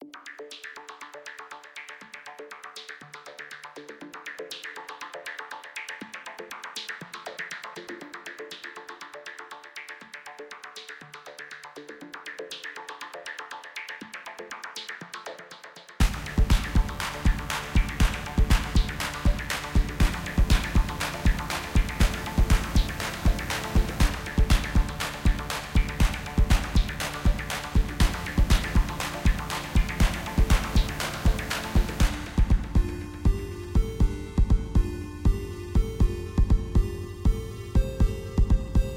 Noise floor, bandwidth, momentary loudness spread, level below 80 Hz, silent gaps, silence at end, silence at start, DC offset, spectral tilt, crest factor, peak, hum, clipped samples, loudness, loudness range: -47 dBFS; 16.5 kHz; 16 LU; -28 dBFS; none; 0 s; 0 s; under 0.1%; -5 dB/octave; 18 dB; -8 dBFS; none; under 0.1%; -28 LUFS; 14 LU